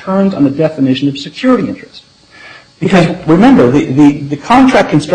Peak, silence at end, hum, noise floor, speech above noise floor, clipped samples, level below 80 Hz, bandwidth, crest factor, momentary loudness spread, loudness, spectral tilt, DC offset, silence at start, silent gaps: 0 dBFS; 0 s; none; -36 dBFS; 27 dB; under 0.1%; -40 dBFS; 9.4 kHz; 10 dB; 10 LU; -10 LUFS; -7 dB/octave; under 0.1%; 0 s; none